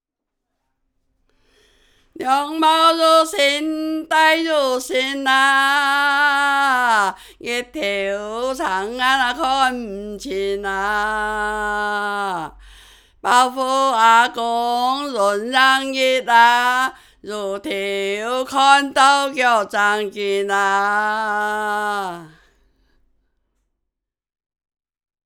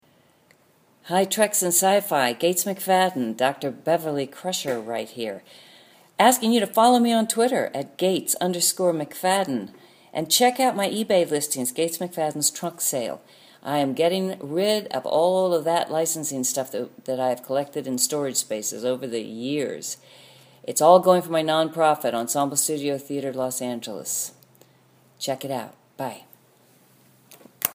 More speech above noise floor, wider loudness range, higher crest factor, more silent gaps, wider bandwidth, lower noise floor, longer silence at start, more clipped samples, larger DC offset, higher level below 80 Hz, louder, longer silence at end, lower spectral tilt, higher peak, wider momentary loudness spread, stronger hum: first, 63 dB vs 37 dB; about the same, 6 LU vs 6 LU; about the same, 18 dB vs 22 dB; neither; first, 20 kHz vs 15.5 kHz; first, -81 dBFS vs -60 dBFS; first, 2.2 s vs 1.05 s; neither; neither; first, -52 dBFS vs -76 dBFS; first, -17 LUFS vs -23 LUFS; first, 2.95 s vs 0 s; about the same, -2 dB/octave vs -3 dB/octave; about the same, 0 dBFS vs -2 dBFS; about the same, 11 LU vs 13 LU; neither